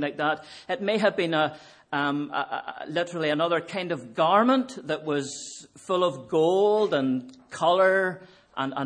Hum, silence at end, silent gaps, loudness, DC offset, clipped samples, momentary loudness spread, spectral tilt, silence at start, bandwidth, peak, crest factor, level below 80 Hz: none; 0 s; none; -25 LUFS; under 0.1%; under 0.1%; 13 LU; -5 dB/octave; 0 s; 10.5 kHz; -6 dBFS; 18 dB; -74 dBFS